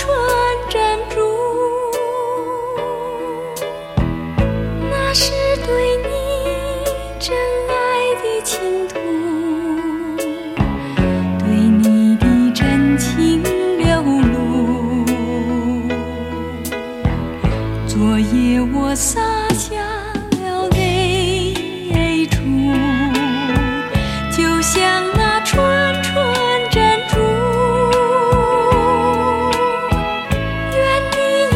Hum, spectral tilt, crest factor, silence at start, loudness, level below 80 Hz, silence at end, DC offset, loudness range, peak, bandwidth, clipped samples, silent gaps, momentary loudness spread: none; -5 dB/octave; 16 dB; 0 s; -17 LUFS; -28 dBFS; 0 s; under 0.1%; 5 LU; 0 dBFS; 16.5 kHz; under 0.1%; none; 8 LU